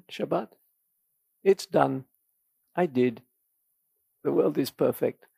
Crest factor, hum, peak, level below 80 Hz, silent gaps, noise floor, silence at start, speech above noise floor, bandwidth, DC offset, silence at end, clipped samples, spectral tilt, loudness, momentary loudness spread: 22 dB; none; -8 dBFS; -78 dBFS; none; -75 dBFS; 0.1 s; 49 dB; 15.5 kHz; under 0.1%; 0.25 s; under 0.1%; -6.5 dB/octave; -27 LUFS; 9 LU